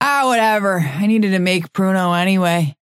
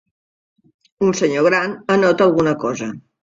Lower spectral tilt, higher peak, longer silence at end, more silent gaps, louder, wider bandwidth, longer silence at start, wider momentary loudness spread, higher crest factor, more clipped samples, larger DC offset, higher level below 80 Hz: about the same, -5.5 dB/octave vs -5.5 dB/octave; about the same, 0 dBFS vs -2 dBFS; about the same, 0.25 s vs 0.25 s; neither; about the same, -16 LUFS vs -17 LUFS; first, 15.5 kHz vs 7.8 kHz; second, 0 s vs 1 s; second, 4 LU vs 9 LU; about the same, 16 dB vs 16 dB; neither; neither; second, -66 dBFS vs -56 dBFS